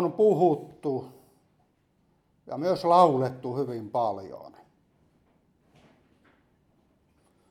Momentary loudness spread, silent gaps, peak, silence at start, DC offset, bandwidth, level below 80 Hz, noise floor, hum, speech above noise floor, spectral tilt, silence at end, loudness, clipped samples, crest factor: 20 LU; none; -6 dBFS; 0 s; under 0.1%; 13.5 kHz; -72 dBFS; -68 dBFS; none; 43 dB; -8 dB/octave; 3 s; -26 LUFS; under 0.1%; 22 dB